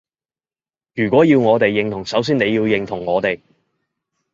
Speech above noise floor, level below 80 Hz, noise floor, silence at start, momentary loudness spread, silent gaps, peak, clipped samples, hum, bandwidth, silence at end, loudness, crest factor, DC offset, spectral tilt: over 74 dB; -54 dBFS; under -90 dBFS; 0.95 s; 10 LU; none; -2 dBFS; under 0.1%; none; 7.6 kHz; 0.95 s; -17 LUFS; 18 dB; under 0.1%; -6.5 dB/octave